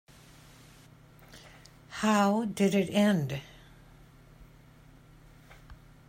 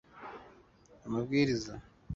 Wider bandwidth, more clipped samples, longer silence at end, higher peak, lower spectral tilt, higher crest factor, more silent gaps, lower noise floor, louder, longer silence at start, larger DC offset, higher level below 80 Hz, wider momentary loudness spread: first, 16 kHz vs 7.8 kHz; neither; first, 0.35 s vs 0 s; about the same, -14 dBFS vs -16 dBFS; about the same, -5.5 dB/octave vs -6 dB/octave; about the same, 18 dB vs 20 dB; neither; second, -56 dBFS vs -61 dBFS; first, -28 LUFS vs -33 LUFS; first, 1.35 s vs 0.15 s; neither; about the same, -60 dBFS vs -58 dBFS; first, 26 LU vs 21 LU